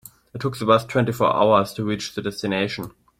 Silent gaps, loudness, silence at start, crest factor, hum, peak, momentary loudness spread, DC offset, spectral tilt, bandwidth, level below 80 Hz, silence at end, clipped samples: none; -21 LUFS; 0.35 s; 20 dB; none; -2 dBFS; 11 LU; under 0.1%; -6 dB/octave; 16.5 kHz; -56 dBFS; 0.3 s; under 0.1%